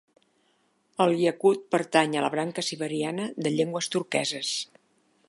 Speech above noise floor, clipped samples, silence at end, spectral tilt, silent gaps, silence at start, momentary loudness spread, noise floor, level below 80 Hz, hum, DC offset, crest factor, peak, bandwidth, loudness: 43 dB; under 0.1%; 0.65 s; -4 dB/octave; none; 1 s; 7 LU; -69 dBFS; -80 dBFS; none; under 0.1%; 22 dB; -6 dBFS; 11.5 kHz; -26 LUFS